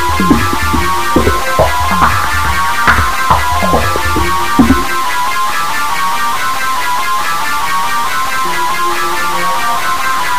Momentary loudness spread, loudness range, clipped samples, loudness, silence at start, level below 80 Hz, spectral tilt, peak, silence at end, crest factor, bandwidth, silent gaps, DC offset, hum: 4 LU; 3 LU; 0.2%; -12 LUFS; 0 s; -26 dBFS; -3.5 dB/octave; 0 dBFS; 0 s; 14 dB; 16 kHz; none; 20%; none